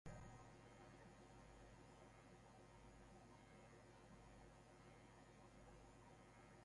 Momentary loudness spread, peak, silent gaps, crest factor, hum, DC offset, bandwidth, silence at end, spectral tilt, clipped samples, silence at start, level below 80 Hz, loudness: 2 LU; -44 dBFS; none; 20 dB; none; under 0.1%; 11 kHz; 0 s; -5.5 dB/octave; under 0.1%; 0.05 s; -72 dBFS; -66 LUFS